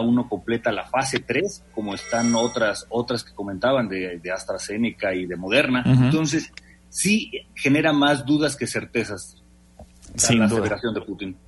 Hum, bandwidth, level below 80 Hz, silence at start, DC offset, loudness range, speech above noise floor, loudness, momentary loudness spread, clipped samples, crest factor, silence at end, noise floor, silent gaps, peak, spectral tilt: none; 11.5 kHz; -52 dBFS; 0 s; under 0.1%; 4 LU; 26 dB; -22 LUFS; 12 LU; under 0.1%; 18 dB; 0.1 s; -48 dBFS; none; -4 dBFS; -4.5 dB/octave